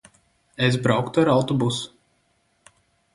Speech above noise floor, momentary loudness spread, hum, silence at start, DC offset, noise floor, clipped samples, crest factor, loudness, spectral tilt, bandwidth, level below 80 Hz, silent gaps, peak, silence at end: 46 dB; 14 LU; none; 0.6 s; under 0.1%; -67 dBFS; under 0.1%; 20 dB; -21 LUFS; -6 dB/octave; 11.5 kHz; -58 dBFS; none; -4 dBFS; 1.25 s